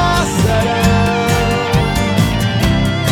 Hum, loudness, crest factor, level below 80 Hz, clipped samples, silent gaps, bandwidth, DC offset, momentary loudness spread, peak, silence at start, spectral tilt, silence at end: none; -14 LUFS; 12 dB; -24 dBFS; under 0.1%; none; 19.5 kHz; under 0.1%; 2 LU; -2 dBFS; 0 s; -5.5 dB/octave; 0 s